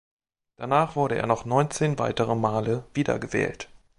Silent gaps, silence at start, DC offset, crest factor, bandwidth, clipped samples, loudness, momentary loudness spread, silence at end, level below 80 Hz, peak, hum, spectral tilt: none; 0.6 s; under 0.1%; 20 dB; 11.5 kHz; under 0.1%; -25 LUFS; 5 LU; 0.35 s; -54 dBFS; -6 dBFS; none; -6 dB/octave